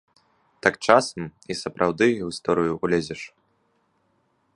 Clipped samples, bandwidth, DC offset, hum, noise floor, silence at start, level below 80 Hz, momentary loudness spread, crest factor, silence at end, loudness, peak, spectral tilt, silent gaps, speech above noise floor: under 0.1%; 11.5 kHz; under 0.1%; none; -68 dBFS; 0.65 s; -58 dBFS; 15 LU; 24 dB; 1.3 s; -23 LUFS; 0 dBFS; -5 dB/octave; none; 45 dB